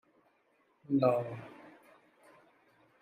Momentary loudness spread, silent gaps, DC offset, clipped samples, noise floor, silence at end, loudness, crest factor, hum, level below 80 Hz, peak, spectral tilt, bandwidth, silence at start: 24 LU; none; under 0.1%; under 0.1%; -72 dBFS; 1.3 s; -32 LUFS; 24 dB; none; -82 dBFS; -14 dBFS; -9 dB/octave; 15 kHz; 0.9 s